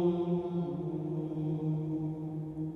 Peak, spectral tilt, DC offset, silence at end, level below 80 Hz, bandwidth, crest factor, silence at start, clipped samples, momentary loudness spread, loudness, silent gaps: -18 dBFS; -11 dB/octave; under 0.1%; 0 s; -62 dBFS; 4 kHz; 14 dB; 0 s; under 0.1%; 5 LU; -35 LUFS; none